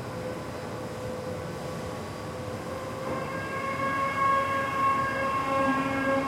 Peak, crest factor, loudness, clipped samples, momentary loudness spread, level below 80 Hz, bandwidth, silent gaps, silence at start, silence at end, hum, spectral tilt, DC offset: -14 dBFS; 14 dB; -29 LUFS; under 0.1%; 11 LU; -56 dBFS; 16.5 kHz; none; 0 s; 0 s; none; -5.5 dB/octave; under 0.1%